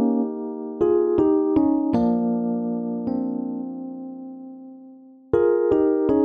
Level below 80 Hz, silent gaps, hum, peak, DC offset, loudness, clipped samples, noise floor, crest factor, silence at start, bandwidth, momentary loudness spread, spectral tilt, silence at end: -52 dBFS; none; none; -8 dBFS; under 0.1%; -22 LUFS; under 0.1%; -46 dBFS; 14 dB; 0 s; 4.9 kHz; 17 LU; -10.5 dB/octave; 0 s